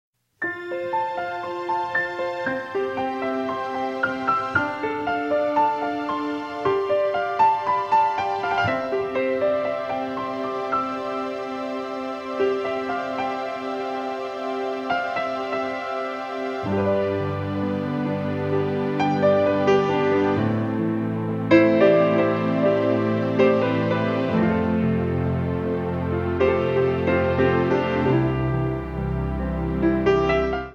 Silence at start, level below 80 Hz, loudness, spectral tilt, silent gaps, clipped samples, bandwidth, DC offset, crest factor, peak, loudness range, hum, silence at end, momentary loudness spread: 0.4 s; -44 dBFS; -23 LUFS; -8 dB/octave; none; under 0.1%; 7.8 kHz; under 0.1%; 20 dB; -2 dBFS; 7 LU; none; 0 s; 9 LU